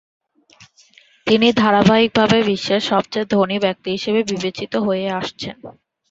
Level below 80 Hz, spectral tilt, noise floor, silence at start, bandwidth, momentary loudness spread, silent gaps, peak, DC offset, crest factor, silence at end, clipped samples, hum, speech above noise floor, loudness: -52 dBFS; -5.5 dB/octave; -52 dBFS; 1.25 s; 7.8 kHz; 11 LU; none; -2 dBFS; under 0.1%; 18 dB; 0.4 s; under 0.1%; none; 34 dB; -17 LUFS